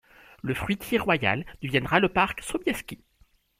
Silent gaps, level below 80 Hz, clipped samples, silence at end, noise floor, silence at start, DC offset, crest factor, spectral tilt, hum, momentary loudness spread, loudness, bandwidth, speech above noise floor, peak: none; -50 dBFS; under 0.1%; 0.65 s; -63 dBFS; 0.45 s; under 0.1%; 22 dB; -5 dB/octave; none; 12 LU; -26 LUFS; 16.5 kHz; 37 dB; -4 dBFS